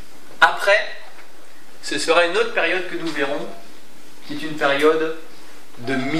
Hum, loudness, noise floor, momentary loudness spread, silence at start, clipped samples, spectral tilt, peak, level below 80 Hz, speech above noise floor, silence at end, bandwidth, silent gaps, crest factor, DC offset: none; -19 LUFS; -47 dBFS; 17 LU; 0.3 s; under 0.1%; -3.5 dB/octave; 0 dBFS; -70 dBFS; 27 dB; 0 s; 15.5 kHz; none; 22 dB; 5%